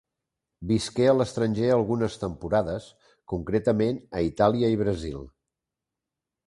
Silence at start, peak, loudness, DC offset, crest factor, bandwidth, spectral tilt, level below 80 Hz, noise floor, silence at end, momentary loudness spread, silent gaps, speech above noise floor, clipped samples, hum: 0.6 s; -6 dBFS; -25 LUFS; under 0.1%; 20 dB; 11.5 kHz; -7 dB/octave; -48 dBFS; -87 dBFS; 1.2 s; 12 LU; none; 63 dB; under 0.1%; none